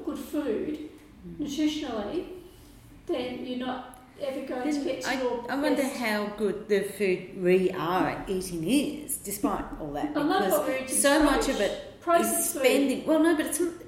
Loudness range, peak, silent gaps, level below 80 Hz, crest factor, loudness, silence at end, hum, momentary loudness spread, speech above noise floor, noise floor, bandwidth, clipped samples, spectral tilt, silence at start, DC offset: 9 LU; -10 dBFS; none; -52 dBFS; 18 dB; -27 LUFS; 0 s; none; 12 LU; 23 dB; -50 dBFS; 16.5 kHz; under 0.1%; -3.5 dB/octave; 0 s; under 0.1%